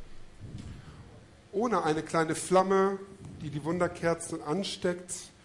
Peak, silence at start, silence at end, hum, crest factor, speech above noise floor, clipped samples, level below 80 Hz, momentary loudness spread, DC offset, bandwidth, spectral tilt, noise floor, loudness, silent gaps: -12 dBFS; 0 s; 0.15 s; none; 20 dB; 24 dB; under 0.1%; -56 dBFS; 20 LU; under 0.1%; 11.5 kHz; -5 dB/octave; -53 dBFS; -30 LUFS; none